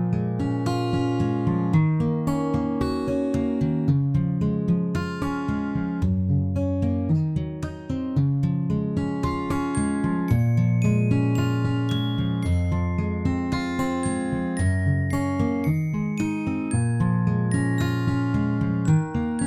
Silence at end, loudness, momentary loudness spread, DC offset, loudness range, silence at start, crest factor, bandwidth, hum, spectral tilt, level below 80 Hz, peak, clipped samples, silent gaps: 0 s; -24 LUFS; 5 LU; under 0.1%; 2 LU; 0 s; 14 dB; 12.5 kHz; none; -7.5 dB/octave; -46 dBFS; -8 dBFS; under 0.1%; none